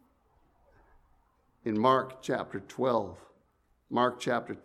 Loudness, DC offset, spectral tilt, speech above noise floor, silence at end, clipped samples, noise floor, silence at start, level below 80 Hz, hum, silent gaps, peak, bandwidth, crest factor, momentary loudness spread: -30 LUFS; under 0.1%; -5.5 dB/octave; 41 dB; 0.05 s; under 0.1%; -70 dBFS; 1.65 s; -68 dBFS; none; none; -10 dBFS; 14 kHz; 22 dB; 12 LU